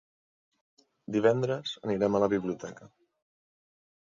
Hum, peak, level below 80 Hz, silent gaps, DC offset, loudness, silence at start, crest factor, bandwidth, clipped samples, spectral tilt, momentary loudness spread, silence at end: none; -10 dBFS; -66 dBFS; none; under 0.1%; -29 LUFS; 1.1 s; 22 dB; 7.6 kHz; under 0.1%; -6.5 dB/octave; 14 LU; 1.15 s